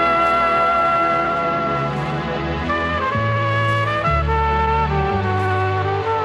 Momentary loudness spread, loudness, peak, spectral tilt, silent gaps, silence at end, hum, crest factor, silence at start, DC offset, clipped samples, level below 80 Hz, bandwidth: 6 LU; -18 LUFS; -6 dBFS; -7 dB/octave; none; 0 s; none; 12 dB; 0 s; under 0.1%; under 0.1%; -32 dBFS; 10 kHz